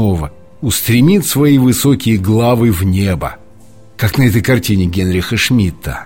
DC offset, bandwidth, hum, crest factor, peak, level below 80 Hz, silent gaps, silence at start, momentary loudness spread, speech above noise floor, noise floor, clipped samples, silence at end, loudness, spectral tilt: under 0.1%; 17 kHz; none; 12 dB; 0 dBFS; -32 dBFS; none; 0 s; 9 LU; 30 dB; -42 dBFS; under 0.1%; 0 s; -12 LUFS; -5.5 dB/octave